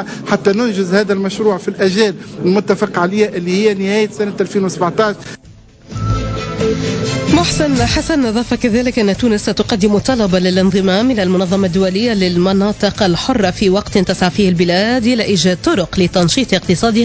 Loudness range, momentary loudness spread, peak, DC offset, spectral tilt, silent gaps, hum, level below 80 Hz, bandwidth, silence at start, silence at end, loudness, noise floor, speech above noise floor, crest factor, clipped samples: 3 LU; 5 LU; 0 dBFS; under 0.1%; -5.5 dB/octave; none; none; -34 dBFS; 8 kHz; 0 s; 0 s; -14 LUFS; -39 dBFS; 26 dB; 14 dB; under 0.1%